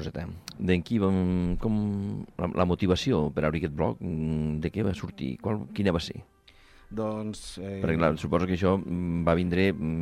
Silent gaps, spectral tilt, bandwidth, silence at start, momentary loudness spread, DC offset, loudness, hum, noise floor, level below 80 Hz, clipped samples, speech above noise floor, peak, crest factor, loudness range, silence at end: none; -7.5 dB/octave; 12.5 kHz; 0 s; 10 LU; under 0.1%; -28 LUFS; none; -56 dBFS; -46 dBFS; under 0.1%; 28 dB; -10 dBFS; 18 dB; 4 LU; 0 s